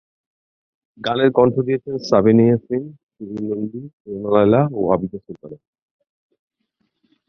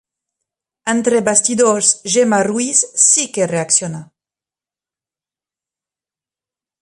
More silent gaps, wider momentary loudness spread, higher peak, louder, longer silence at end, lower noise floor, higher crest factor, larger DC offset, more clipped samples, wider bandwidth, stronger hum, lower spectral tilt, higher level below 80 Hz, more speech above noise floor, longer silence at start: first, 3.03-3.09 s, 3.93-4.05 s vs none; first, 21 LU vs 9 LU; about the same, 0 dBFS vs 0 dBFS; second, -18 LUFS vs -13 LUFS; second, 1.75 s vs 2.8 s; second, -71 dBFS vs under -90 dBFS; about the same, 18 dB vs 18 dB; neither; neither; second, 6.6 kHz vs 11.5 kHz; neither; first, -8 dB/octave vs -2.5 dB/octave; first, -54 dBFS vs -64 dBFS; second, 53 dB vs over 75 dB; first, 1 s vs 0.85 s